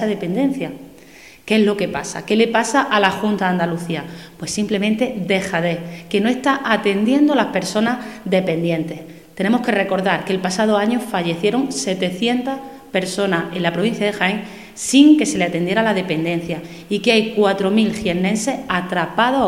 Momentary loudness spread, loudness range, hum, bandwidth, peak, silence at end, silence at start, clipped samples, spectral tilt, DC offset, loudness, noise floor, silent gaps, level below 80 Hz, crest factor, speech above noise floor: 10 LU; 3 LU; none; 16 kHz; 0 dBFS; 0 s; 0 s; under 0.1%; -5 dB/octave; 0.2%; -18 LUFS; -43 dBFS; none; -54 dBFS; 18 dB; 25 dB